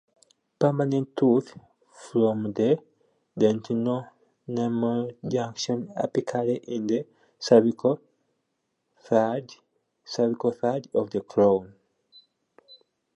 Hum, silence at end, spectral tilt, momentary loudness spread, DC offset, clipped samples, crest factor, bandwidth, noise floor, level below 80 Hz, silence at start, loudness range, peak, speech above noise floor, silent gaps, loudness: none; 0.4 s; -7 dB/octave; 10 LU; under 0.1%; under 0.1%; 22 dB; 9 kHz; -78 dBFS; -70 dBFS; 0.6 s; 3 LU; -4 dBFS; 53 dB; none; -26 LUFS